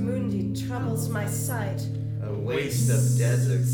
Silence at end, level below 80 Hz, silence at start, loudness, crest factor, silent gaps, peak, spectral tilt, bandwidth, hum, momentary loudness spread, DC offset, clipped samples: 0 s; -52 dBFS; 0 s; -26 LUFS; 12 dB; none; -12 dBFS; -6 dB/octave; 19 kHz; none; 8 LU; under 0.1%; under 0.1%